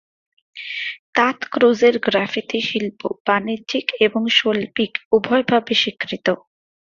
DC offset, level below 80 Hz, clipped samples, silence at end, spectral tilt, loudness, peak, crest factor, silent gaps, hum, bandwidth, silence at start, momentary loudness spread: under 0.1%; -62 dBFS; under 0.1%; 0.5 s; -4.5 dB/octave; -19 LUFS; -2 dBFS; 18 dB; 0.99-1.13 s, 3.20-3.25 s, 5.05-5.11 s; none; 7.4 kHz; 0.55 s; 10 LU